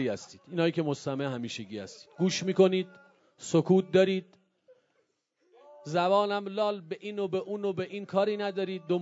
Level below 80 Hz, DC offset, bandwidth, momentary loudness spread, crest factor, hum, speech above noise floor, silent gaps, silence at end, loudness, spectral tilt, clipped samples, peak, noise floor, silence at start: -78 dBFS; under 0.1%; 8 kHz; 14 LU; 20 dB; none; 46 dB; none; 0 s; -29 LUFS; -6 dB/octave; under 0.1%; -10 dBFS; -75 dBFS; 0 s